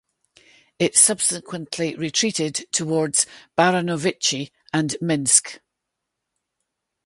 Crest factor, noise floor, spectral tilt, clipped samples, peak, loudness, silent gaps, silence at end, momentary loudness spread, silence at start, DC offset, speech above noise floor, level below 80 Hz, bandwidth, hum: 22 dB; -81 dBFS; -2.5 dB/octave; under 0.1%; -2 dBFS; -20 LUFS; none; 1.5 s; 11 LU; 0.8 s; under 0.1%; 60 dB; -66 dBFS; 12 kHz; none